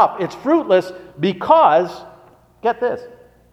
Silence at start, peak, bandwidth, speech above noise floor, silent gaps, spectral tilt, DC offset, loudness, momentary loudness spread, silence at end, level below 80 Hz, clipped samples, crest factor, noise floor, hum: 0 s; 0 dBFS; 12 kHz; 31 dB; none; -6.5 dB/octave; under 0.1%; -17 LUFS; 16 LU; 0.45 s; -58 dBFS; under 0.1%; 18 dB; -48 dBFS; none